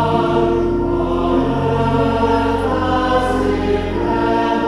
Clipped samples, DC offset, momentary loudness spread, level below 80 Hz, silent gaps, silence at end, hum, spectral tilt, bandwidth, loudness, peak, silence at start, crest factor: under 0.1%; under 0.1%; 2 LU; -30 dBFS; none; 0 s; none; -7.5 dB/octave; 11.5 kHz; -17 LUFS; -4 dBFS; 0 s; 12 dB